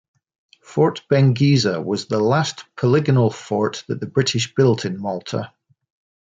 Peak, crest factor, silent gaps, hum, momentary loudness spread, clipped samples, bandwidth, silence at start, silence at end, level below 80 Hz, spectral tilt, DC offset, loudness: -4 dBFS; 16 dB; none; none; 10 LU; under 0.1%; 9 kHz; 0.7 s; 0.75 s; -60 dBFS; -6 dB/octave; under 0.1%; -19 LUFS